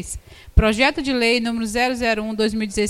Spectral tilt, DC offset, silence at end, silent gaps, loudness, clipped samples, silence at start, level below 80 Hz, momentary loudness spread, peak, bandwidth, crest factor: -4.5 dB/octave; under 0.1%; 0 s; none; -19 LUFS; under 0.1%; 0 s; -30 dBFS; 5 LU; 0 dBFS; 15.5 kHz; 20 dB